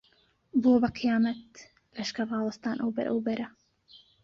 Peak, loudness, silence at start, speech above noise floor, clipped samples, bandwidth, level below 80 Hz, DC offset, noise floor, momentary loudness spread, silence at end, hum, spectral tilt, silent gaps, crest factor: -12 dBFS; -29 LUFS; 0.55 s; 39 dB; under 0.1%; 7.6 kHz; -64 dBFS; under 0.1%; -67 dBFS; 12 LU; 0.25 s; none; -6 dB/octave; none; 18 dB